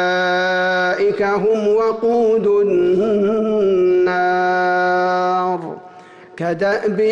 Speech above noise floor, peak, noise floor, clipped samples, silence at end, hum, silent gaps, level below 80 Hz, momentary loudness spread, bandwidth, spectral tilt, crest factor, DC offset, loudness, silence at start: 25 dB; -8 dBFS; -40 dBFS; under 0.1%; 0 s; none; none; -56 dBFS; 5 LU; 7.6 kHz; -6 dB/octave; 8 dB; under 0.1%; -16 LUFS; 0 s